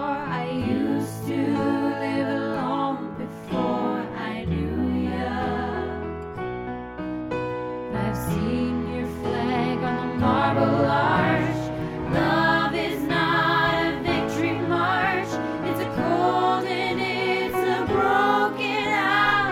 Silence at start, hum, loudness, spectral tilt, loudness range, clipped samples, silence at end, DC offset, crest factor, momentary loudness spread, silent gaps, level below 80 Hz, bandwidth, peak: 0 s; none; -24 LUFS; -6.5 dB/octave; 6 LU; under 0.1%; 0 s; under 0.1%; 16 dB; 10 LU; none; -46 dBFS; 16.5 kHz; -8 dBFS